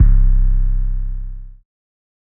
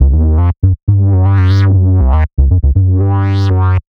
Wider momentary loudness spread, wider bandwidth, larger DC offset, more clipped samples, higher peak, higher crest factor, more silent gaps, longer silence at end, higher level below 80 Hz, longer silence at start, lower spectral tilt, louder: first, 18 LU vs 3 LU; second, 1.7 kHz vs 5.4 kHz; neither; neither; about the same, -2 dBFS vs 0 dBFS; about the same, 12 dB vs 8 dB; second, none vs 0.83-0.87 s; first, 0.75 s vs 0.2 s; about the same, -14 dBFS vs -14 dBFS; about the same, 0 s vs 0 s; first, -13 dB/octave vs -9.5 dB/octave; second, -20 LUFS vs -11 LUFS